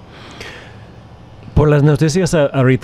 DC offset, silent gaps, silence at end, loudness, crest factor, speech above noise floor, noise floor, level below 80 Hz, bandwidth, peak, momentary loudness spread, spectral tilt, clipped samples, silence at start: under 0.1%; none; 0.05 s; -13 LUFS; 14 dB; 26 dB; -38 dBFS; -32 dBFS; 12.5 kHz; -2 dBFS; 21 LU; -7 dB/octave; under 0.1%; 0.15 s